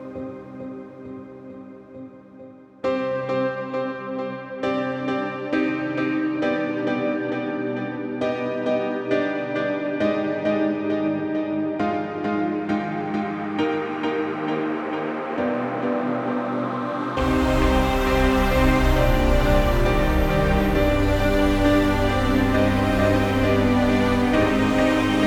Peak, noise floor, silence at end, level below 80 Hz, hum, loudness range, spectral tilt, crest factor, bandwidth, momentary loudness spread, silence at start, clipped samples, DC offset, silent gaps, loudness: -6 dBFS; -44 dBFS; 0 s; -30 dBFS; none; 7 LU; -6.5 dB/octave; 16 dB; 18 kHz; 10 LU; 0 s; under 0.1%; under 0.1%; none; -22 LUFS